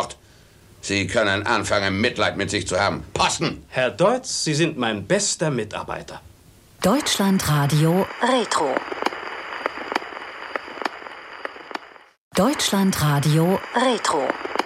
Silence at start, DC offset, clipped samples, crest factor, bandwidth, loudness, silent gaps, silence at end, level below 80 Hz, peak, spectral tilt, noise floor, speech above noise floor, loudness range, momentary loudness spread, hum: 0 s; under 0.1%; under 0.1%; 20 dB; 16 kHz; -22 LUFS; 12.17-12.31 s; 0 s; -50 dBFS; -4 dBFS; -4.5 dB/octave; -51 dBFS; 30 dB; 6 LU; 14 LU; none